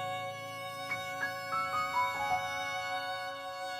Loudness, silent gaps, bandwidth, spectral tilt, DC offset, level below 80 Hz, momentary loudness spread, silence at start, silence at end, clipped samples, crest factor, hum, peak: -35 LUFS; none; over 20 kHz; -2.5 dB/octave; under 0.1%; -72 dBFS; 8 LU; 0 s; 0 s; under 0.1%; 16 dB; none; -20 dBFS